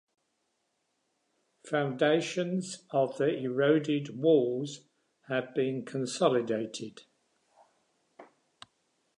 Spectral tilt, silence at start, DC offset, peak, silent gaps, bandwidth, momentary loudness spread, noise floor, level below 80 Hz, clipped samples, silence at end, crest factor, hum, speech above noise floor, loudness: -5.5 dB/octave; 1.65 s; under 0.1%; -12 dBFS; none; 11 kHz; 10 LU; -78 dBFS; -84 dBFS; under 0.1%; 0.95 s; 20 dB; none; 49 dB; -30 LUFS